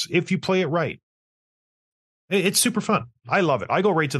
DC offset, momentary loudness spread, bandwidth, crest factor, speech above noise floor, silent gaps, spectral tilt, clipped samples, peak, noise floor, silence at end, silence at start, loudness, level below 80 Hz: under 0.1%; 6 LU; 12.5 kHz; 18 dB; over 68 dB; 1.03-2.28 s; -4 dB/octave; under 0.1%; -6 dBFS; under -90 dBFS; 0 s; 0 s; -22 LUFS; -66 dBFS